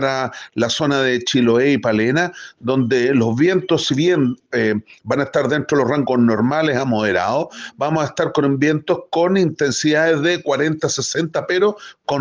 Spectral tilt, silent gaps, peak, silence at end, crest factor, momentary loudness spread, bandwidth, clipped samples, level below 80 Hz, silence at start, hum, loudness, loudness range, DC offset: -5 dB/octave; none; -4 dBFS; 0 s; 14 dB; 6 LU; 10 kHz; under 0.1%; -58 dBFS; 0 s; none; -18 LUFS; 1 LU; under 0.1%